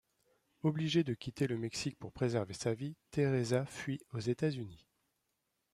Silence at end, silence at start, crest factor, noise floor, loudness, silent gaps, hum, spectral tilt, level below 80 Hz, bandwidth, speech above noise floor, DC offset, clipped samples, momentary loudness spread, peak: 0.95 s; 0.65 s; 18 dB; -83 dBFS; -36 LUFS; none; none; -6 dB/octave; -68 dBFS; 13.5 kHz; 48 dB; under 0.1%; under 0.1%; 8 LU; -20 dBFS